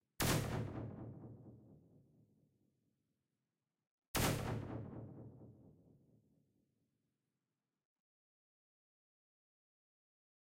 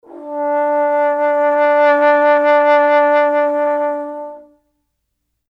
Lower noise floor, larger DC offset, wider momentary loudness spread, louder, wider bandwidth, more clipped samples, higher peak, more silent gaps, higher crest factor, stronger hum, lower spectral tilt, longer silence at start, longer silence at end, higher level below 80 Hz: first, under -90 dBFS vs -72 dBFS; neither; first, 22 LU vs 12 LU; second, -41 LUFS vs -14 LUFS; first, 16 kHz vs 5.6 kHz; neither; second, -22 dBFS vs -4 dBFS; first, 3.87-3.98 s, 4.08-4.14 s vs none; first, 26 dB vs 12 dB; neither; about the same, -4.5 dB/octave vs -3.5 dB/octave; about the same, 0.2 s vs 0.1 s; first, 4.8 s vs 1.1 s; first, -60 dBFS vs -72 dBFS